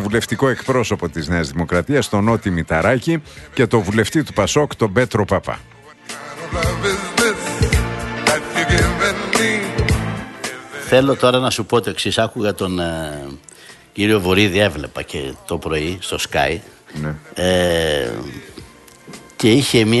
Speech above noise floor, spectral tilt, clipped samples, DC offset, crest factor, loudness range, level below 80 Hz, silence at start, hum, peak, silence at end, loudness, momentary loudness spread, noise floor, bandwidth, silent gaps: 24 dB; -4.5 dB/octave; under 0.1%; under 0.1%; 18 dB; 3 LU; -34 dBFS; 0 s; none; 0 dBFS; 0 s; -18 LUFS; 14 LU; -41 dBFS; 12.5 kHz; none